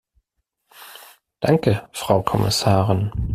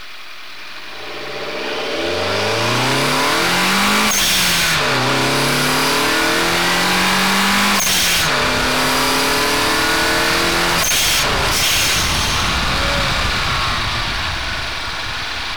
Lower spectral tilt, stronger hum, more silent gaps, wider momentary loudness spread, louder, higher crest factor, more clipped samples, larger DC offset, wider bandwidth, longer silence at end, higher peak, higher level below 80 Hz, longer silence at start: first, -5.5 dB/octave vs -2 dB/octave; neither; neither; first, 20 LU vs 9 LU; second, -20 LUFS vs -15 LUFS; first, 20 dB vs 8 dB; neither; second, under 0.1% vs 2%; second, 15 kHz vs over 20 kHz; about the same, 0 s vs 0 s; first, -2 dBFS vs -8 dBFS; second, -40 dBFS vs -32 dBFS; first, 0.8 s vs 0 s